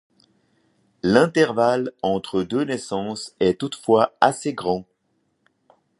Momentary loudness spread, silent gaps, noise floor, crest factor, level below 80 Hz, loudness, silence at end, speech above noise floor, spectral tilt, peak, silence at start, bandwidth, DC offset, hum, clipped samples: 10 LU; none; -70 dBFS; 22 dB; -58 dBFS; -21 LUFS; 1.15 s; 49 dB; -5.5 dB/octave; 0 dBFS; 1.05 s; 11.5 kHz; under 0.1%; none; under 0.1%